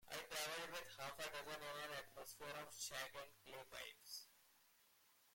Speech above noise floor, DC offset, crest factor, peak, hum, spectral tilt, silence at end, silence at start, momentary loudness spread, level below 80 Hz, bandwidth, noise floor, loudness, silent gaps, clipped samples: 21 dB; under 0.1%; 22 dB; -30 dBFS; none; -1 dB/octave; 0 s; 0 s; 10 LU; -80 dBFS; 16.5 kHz; -75 dBFS; -51 LUFS; none; under 0.1%